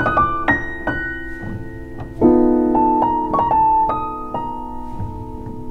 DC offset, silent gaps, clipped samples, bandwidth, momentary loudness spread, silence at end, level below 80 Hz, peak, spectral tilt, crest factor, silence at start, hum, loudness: under 0.1%; none; under 0.1%; 6.2 kHz; 17 LU; 0 s; -34 dBFS; -2 dBFS; -8.5 dB/octave; 16 dB; 0 s; none; -17 LUFS